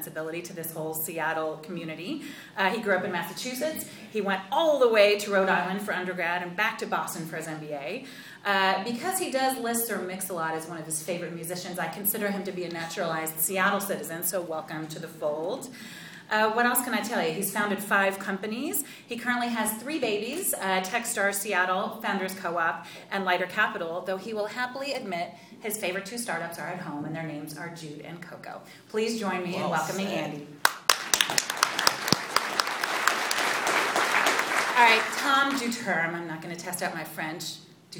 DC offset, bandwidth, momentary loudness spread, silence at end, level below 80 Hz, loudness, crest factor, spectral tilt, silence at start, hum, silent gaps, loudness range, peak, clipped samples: under 0.1%; 19.5 kHz; 13 LU; 0 s; -72 dBFS; -27 LUFS; 28 dB; -2.5 dB/octave; 0 s; none; none; 8 LU; 0 dBFS; under 0.1%